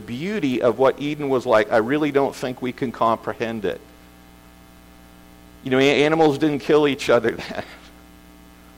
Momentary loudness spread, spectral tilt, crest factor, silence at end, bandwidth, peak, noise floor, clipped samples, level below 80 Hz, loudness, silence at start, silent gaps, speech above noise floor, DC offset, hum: 11 LU; -5.5 dB/octave; 16 dB; 0.9 s; 16.5 kHz; -6 dBFS; -47 dBFS; under 0.1%; -52 dBFS; -20 LUFS; 0 s; none; 27 dB; under 0.1%; 60 Hz at -50 dBFS